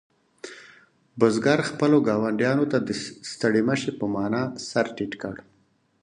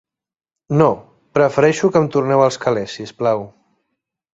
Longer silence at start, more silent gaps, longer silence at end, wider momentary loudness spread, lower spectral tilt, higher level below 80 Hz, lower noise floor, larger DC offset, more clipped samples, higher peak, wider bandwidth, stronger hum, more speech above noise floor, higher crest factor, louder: second, 0.45 s vs 0.7 s; neither; second, 0.65 s vs 0.85 s; first, 21 LU vs 10 LU; about the same, -5.5 dB/octave vs -6.5 dB/octave; second, -64 dBFS vs -56 dBFS; second, -55 dBFS vs -76 dBFS; neither; neither; about the same, -4 dBFS vs -2 dBFS; first, 11 kHz vs 8 kHz; neither; second, 32 dB vs 60 dB; first, 22 dB vs 16 dB; second, -24 LUFS vs -17 LUFS